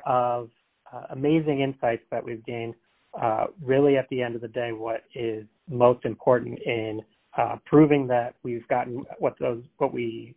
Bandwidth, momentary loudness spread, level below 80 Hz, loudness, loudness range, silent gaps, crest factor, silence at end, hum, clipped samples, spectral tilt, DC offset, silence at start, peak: 4 kHz; 14 LU; -62 dBFS; -26 LUFS; 4 LU; none; 20 dB; 0.05 s; none; under 0.1%; -11 dB/octave; under 0.1%; 0 s; -6 dBFS